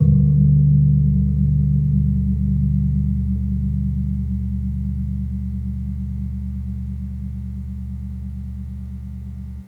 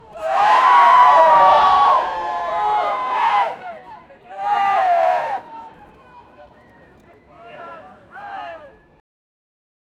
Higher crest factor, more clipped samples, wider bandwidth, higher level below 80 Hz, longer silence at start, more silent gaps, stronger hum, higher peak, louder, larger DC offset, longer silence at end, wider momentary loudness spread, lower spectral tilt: about the same, 16 dB vs 16 dB; neither; second, 2 kHz vs 10.5 kHz; first, -26 dBFS vs -56 dBFS; second, 0 s vs 0.15 s; neither; neither; about the same, -4 dBFS vs -2 dBFS; second, -21 LUFS vs -15 LUFS; neither; second, 0 s vs 1.45 s; second, 16 LU vs 24 LU; first, -12.5 dB/octave vs -3 dB/octave